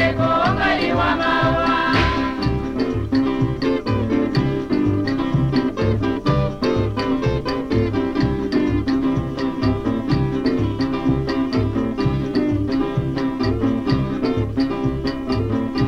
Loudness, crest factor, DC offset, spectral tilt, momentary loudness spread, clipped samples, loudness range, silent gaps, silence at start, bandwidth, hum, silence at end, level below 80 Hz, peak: -20 LUFS; 14 dB; under 0.1%; -7.5 dB/octave; 5 LU; under 0.1%; 2 LU; none; 0 s; 8 kHz; none; 0 s; -34 dBFS; -6 dBFS